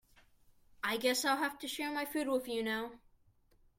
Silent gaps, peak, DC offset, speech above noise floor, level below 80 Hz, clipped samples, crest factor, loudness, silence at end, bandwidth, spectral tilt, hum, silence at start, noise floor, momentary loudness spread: none; -18 dBFS; under 0.1%; 33 dB; -70 dBFS; under 0.1%; 20 dB; -35 LUFS; 0.8 s; 16.5 kHz; -2 dB/octave; none; 0.85 s; -69 dBFS; 8 LU